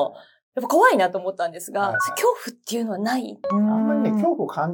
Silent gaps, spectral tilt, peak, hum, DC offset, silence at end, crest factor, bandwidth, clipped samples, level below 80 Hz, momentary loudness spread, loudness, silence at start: 0.43-0.52 s; -5 dB/octave; -4 dBFS; none; under 0.1%; 0 s; 18 dB; 18 kHz; under 0.1%; -78 dBFS; 11 LU; -22 LUFS; 0 s